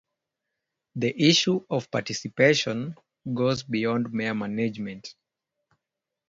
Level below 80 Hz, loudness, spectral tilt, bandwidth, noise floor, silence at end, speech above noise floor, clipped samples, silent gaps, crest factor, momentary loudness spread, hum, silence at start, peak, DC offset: -66 dBFS; -25 LUFS; -4.5 dB/octave; 7.8 kHz; -86 dBFS; 1.2 s; 61 dB; under 0.1%; none; 22 dB; 17 LU; none; 0.95 s; -6 dBFS; under 0.1%